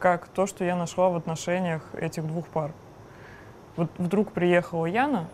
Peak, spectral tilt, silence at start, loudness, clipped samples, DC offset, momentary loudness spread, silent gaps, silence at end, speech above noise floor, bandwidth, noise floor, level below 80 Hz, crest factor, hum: -8 dBFS; -6.5 dB/octave; 0 s; -27 LUFS; under 0.1%; under 0.1%; 23 LU; none; 0 s; 21 dB; 14.5 kHz; -47 dBFS; -60 dBFS; 20 dB; none